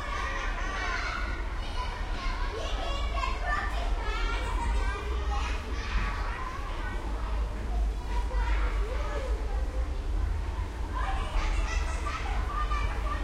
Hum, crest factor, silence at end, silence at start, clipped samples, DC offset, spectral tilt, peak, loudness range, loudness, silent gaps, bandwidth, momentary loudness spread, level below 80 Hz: none; 14 dB; 0 s; 0 s; under 0.1%; under 0.1%; -5 dB/octave; -16 dBFS; 1 LU; -33 LUFS; none; 10.5 kHz; 4 LU; -30 dBFS